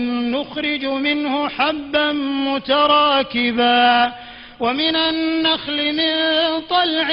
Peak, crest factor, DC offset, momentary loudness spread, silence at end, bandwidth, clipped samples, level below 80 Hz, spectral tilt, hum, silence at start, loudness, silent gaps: -4 dBFS; 14 dB; under 0.1%; 8 LU; 0 s; 5.6 kHz; under 0.1%; -52 dBFS; -6.5 dB/octave; none; 0 s; -17 LUFS; none